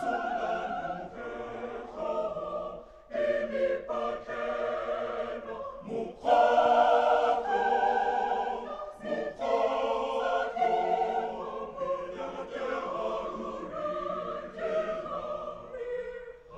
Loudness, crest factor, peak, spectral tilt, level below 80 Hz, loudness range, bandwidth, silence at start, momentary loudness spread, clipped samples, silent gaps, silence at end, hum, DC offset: -31 LUFS; 20 dB; -12 dBFS; -5 dB/octave; -58 dBFS; 9 LU; 8.6 kHz; 0 s; 14 LU; under 0.1%; none; 0 s; none; under 0.1%